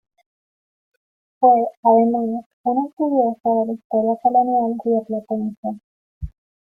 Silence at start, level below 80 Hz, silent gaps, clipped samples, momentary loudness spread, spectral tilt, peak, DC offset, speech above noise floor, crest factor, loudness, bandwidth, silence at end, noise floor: 1.4 s; -48 dBFS; 1.77-1.83 s, 2.46-2.64 s, 2.93-2.97 s, 3.84-3.90 s, 5.57-5.63 s, 5.84-6.21 s; under 0.1%; 15 LU; -11.5 dB/octave; -2 dBFS; under 0.1%; over 71 dB; 18 dB; -19 LUFS; 2.5 kHz; 0.5 s; under -90 dBFS